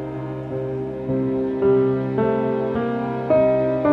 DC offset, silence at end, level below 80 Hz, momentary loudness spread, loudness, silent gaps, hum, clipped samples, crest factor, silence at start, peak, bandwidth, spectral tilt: under 0.1%; 0 s; -48 dBFS; 10 LU; -21 LUFS; none; none; under 0.1%; 16 dB; 0 s; -6 dBFS; 4.9 kHz; -10 dB/octave